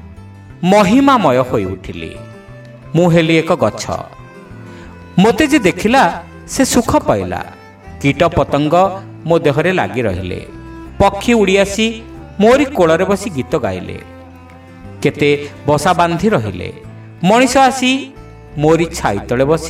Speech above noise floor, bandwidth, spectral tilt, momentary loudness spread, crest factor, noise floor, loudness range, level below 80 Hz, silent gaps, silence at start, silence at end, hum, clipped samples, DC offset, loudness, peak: 24 dB; 16.5 kHz; -5.5 dB/octave; 19 LU; 14 dB; -37 dBFS; 3 LU; -38 dBFS; none; 0.05 s; 0 s; none; under 0.1%; under 0.1%; -13 LUFS; 0 dBFS